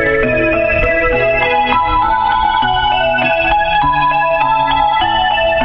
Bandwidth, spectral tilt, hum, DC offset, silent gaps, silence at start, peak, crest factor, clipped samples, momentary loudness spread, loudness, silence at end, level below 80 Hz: 5.6 kHz; -7 dB/octave; none; under 0.1%; none; 0 s; 0 dBFS; 12 dB; under 0.1%; 1 LU; -12 LUFS; 0 s; -28 dBFS